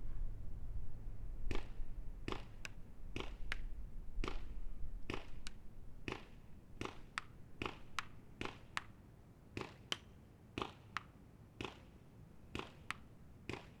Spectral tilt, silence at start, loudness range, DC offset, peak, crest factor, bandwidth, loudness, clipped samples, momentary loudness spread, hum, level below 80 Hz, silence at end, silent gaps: -4.5 dB/octave; 0 s; 2 LU; under 0.1%; -18 dBFS; 26 dB; 11.5 kHz; -49 LUFS; under 0.1%; 15 LU; none; -50 dBFS; 0 s; none